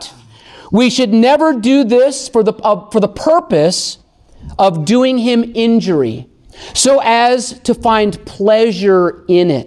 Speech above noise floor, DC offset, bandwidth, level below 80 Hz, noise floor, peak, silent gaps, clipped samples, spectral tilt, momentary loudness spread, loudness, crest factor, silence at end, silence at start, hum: 28 dB; under 0.1%; 12.5 kHz; -44 dBFS; -39 dBFS; 0 dBFS; none; under 0.1%; -4.5 dB/octave; 8 LU; -12 LUFS; 12 dB; 0 s; 0 s; none